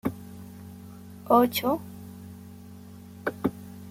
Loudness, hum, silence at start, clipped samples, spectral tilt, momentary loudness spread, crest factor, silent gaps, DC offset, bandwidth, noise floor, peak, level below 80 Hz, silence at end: -26 LUFS; none; 0.05 s; under 0.1%; -5.5 dB/octave; 24 LU; 22 dB; none; under 0.1%; 16.5 kHz; -45 dBFS; -8 dBFS; -64 dBFS; 0 s